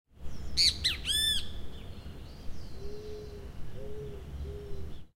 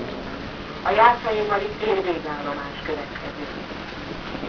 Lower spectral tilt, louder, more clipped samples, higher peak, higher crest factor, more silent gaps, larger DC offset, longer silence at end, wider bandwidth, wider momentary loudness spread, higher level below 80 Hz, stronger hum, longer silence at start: second, -2 dB/octave vs -6 dB/octave; second, -28 LUFS vs -24 LUFS; neither; second, -12 dBFS vs -2 dBFS; about the same, 22 dB vs 22 dB; neither; second, under 0.1% vs 0.1%; about the same, 0.1 s vs 0 s; first, 16 kHz vs 5.4 kHz; first, 22 LU vs 16 LU; about the same, -44 dBFS vs -46 dBFS; neither; first, 0.15 s vs 0 s